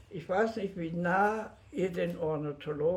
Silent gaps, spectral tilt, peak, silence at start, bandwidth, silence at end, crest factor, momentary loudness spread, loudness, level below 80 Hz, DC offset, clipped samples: none; -7 dB/octave; -16 dBFS; 0.1 s; 13.5 kHz; 0 s; 16 dB; 9 LU; -32 LUFS; -62 dBFS; under 0.1%; under 0.1%